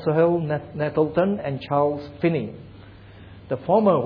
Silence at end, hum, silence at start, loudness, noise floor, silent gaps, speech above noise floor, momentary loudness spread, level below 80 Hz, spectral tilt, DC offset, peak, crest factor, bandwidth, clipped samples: 0 s; none; 0 s; -23 LUFS; -44 dBFS; none; 22 dB; 11 LU; -54 dBFS; -10.5 dB/octave; under 0.1%; -6 dBFS; 16 dB; 5.4 kHz; under 0.1%